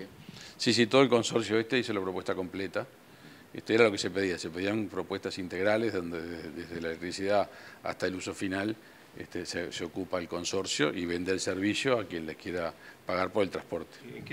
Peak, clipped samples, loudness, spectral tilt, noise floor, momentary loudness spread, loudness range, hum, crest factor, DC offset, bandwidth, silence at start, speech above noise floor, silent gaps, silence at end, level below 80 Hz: -8 dBFS; under 0.1%; -31 LUFS; -4 dB/octave; -53 dBFS; 15 LU; 5 LU; none; 24 dB; under 0.1%; 16 kHz; 0 s; 22 dB; none; 0 s; -66 dBFS